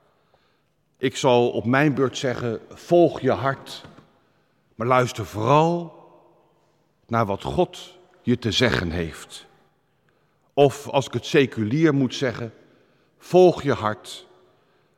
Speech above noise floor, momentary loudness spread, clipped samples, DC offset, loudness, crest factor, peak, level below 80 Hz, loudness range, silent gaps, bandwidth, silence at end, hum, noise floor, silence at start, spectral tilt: 46 dB; 16 LU; under 0.1%; under 0.1%; -22 LUFS; 20 dB; -4 dBFS; -52 dBFS; 4 LU; none; 14 kHz; 0.75 s; none; -67 dBFS; 1 s; -6 dB/octave